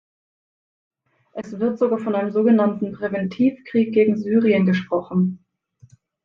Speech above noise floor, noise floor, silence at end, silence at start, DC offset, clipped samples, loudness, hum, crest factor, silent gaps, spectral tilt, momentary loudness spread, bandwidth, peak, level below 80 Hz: 35 dB; -54 dBFS; 0.9 s; 1.35 s; under 0.1%; under 0.1%; -20 LUFS; none; 16 dB; none; -9 dB/octave; 9 LU; 6.4 kHz; -6 dBFS; -66 dBFS